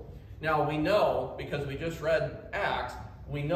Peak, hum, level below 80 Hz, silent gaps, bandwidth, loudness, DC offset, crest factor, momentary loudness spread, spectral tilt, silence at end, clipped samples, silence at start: -14 dBFS; none; -50 dBFS; none; 15 kHz; -30 LUFS; under 0.1%; 16 dB; 13 LU; -6.5 dB/octave; 0 s; under 0.1%; 0 s